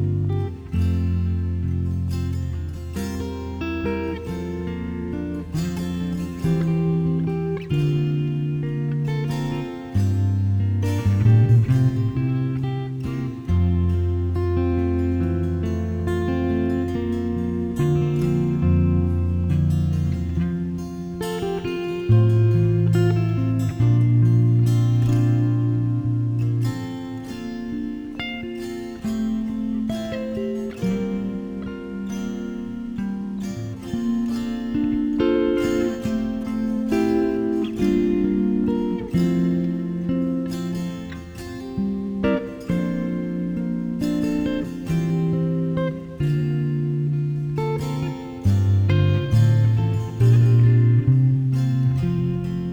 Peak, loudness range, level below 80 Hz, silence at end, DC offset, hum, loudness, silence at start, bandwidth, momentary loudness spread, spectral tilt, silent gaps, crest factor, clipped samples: -6 dBFS; 8 LU; -38 dBFS; 0 s; under 0.1%; none; -22 LUFS; 0 s; 9.6 kHz; 11 LU; -8.5 dB/octave; none; 16 dB; under 0.1%